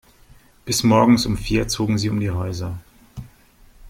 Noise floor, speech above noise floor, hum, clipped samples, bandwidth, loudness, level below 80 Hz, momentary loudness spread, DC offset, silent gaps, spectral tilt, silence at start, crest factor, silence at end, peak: -51 dBFS; 32 dB; none; under 0.1%; 16.5 kHz; -19 LUFS; -38 dBFS; 25 LU; under 0.1%; none; -5 dB/octave; 0.65 s; 18 dB; 0 s; -2 dBFS